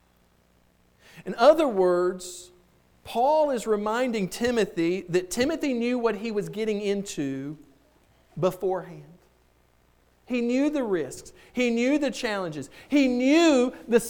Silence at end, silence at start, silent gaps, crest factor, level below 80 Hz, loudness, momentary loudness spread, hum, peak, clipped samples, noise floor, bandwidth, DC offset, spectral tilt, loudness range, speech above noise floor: 0 s; 1.15 s; none; 20 dB; -58 dBFS; -25 LUFS; 16 LU; none; -6 dBFS; under 0.1%; -63 dBFS; 19 kHz; under 0.1%; -5 dB/octave; 7 LU; 38 dB